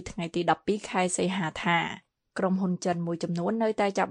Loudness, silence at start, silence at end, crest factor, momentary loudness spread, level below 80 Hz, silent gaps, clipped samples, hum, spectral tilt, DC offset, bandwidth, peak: -28 LUFS; 0 s; 0 s; 18 dB; 5 LU; -60 dBFS; none; under 0.1%; none; -5 dB/octave; under 0.1%; 10.5 kHz; -10 dBFS